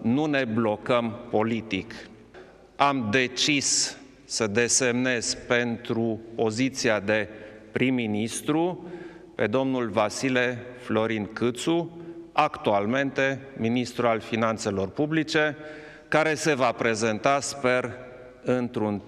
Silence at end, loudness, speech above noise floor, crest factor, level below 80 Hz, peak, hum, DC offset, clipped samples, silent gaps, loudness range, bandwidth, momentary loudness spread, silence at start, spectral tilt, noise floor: 0 s; -25 LUFS; 24 dB; 22 dB; -60 dBFS; -4 dBFS; none; under 0.1%; under 0.1%; none; 3 LU; 14 kHz; 13 LU; 0 s; -4 dB/octave; -49 dBFS